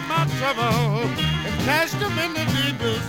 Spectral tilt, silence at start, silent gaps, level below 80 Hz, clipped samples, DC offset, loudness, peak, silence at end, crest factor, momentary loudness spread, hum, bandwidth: -5 dB/octave; 0 s; none; -44 dBFS; under 0.1%; under 0.1%; -22 LUFS; -6 dBFS; 0 s; 16 dB; 3 LU; none; 17 kHz